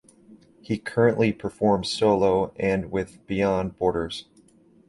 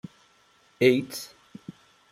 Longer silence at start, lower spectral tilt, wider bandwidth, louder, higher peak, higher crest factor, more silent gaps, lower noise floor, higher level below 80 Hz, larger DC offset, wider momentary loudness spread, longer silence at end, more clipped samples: second, 0.3 s vs 0.8 s; about the same, -6 dB/octave vs -5 dB/octave; second, 11.5 kHz vs 16 kHz; about the same, -24 LUFS vs -25 LUFS; about the same, -6 dBFS vs -6 dBFS; second, 18 dB vs 24 dB; neither; second, -56 dBFS vs -62 dBFS; first, -50 dBFS vs -72 dBFS; neither; second, 10 LU vs 25 LU; first, 0.65 s vs 0.4 s; neither